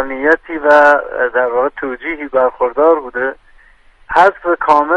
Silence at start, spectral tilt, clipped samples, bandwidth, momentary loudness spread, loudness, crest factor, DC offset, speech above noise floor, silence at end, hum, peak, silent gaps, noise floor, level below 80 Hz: 0 s; -5 dB/octave; under 0.1%; 9.4 kHz; 11 LU; -13 LUFS; 14 dB; under 0.1%; 33 dB; 0 s; none; 0 dBFS; none; -46 dBFS; -46 dBFS